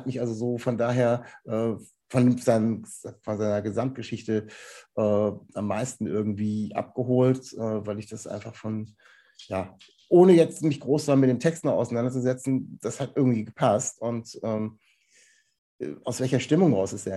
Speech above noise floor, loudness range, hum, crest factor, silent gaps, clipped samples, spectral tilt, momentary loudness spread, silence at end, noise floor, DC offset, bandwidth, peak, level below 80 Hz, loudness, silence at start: 36 dB; 6 LU; none; 20 dB; 15.58-15.79 s; under 0.1%; -6.5 dB/octave; 14 LU; 0 s; -61 dBFS; under 0.1%; 12.5 kHz; -6 dBFS; -68 dBFS; -26 LUFS; 0 s